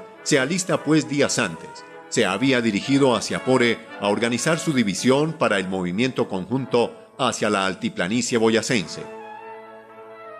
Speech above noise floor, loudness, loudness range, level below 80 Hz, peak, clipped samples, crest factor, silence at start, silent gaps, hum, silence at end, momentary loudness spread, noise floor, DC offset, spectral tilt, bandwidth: 21 dB; -21 LUFS; 3 LU; -60 dBFS; -6 dBFS; under 0.1%; 18 dB; 0 s; none; none; 0 s; 16 LU; -42 dBFS; under 0.1%; -4.5 dB/octave; 14 kHz